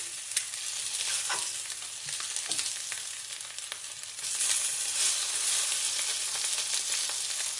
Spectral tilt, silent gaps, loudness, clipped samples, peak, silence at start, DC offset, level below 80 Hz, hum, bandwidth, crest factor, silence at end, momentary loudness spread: 3 dB/octave; none; -29 LUFS; under 0.1%; -10 dBFS; 0 s; under 0.1%; -80 dBFS; none; 12 kHz; 24 dB; 0 s; 11 LU